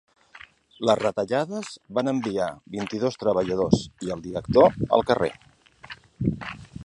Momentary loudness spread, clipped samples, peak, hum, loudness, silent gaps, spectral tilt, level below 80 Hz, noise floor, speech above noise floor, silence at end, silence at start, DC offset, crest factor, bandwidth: 15 LU; under 0.1%; -4 dBFS; none; -24 LUFS; none; -6.5 dB/octave; -50 dBFS; -50 dBFS; 26 dB; 0 s; 0.35 s; under 0.1%; 22 dB; 11 kHz